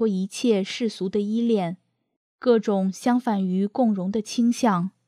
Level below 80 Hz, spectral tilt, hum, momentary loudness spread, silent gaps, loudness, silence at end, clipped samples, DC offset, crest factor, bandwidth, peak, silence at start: -72 dBFS; -6 dB/octave; none; 6 LU; 2.16-2.39 s; -23 LUFS; 0.2 s; under 0.1%; under 0.1%; 16 dB; 14 kHz; -6 dBFS; 0 s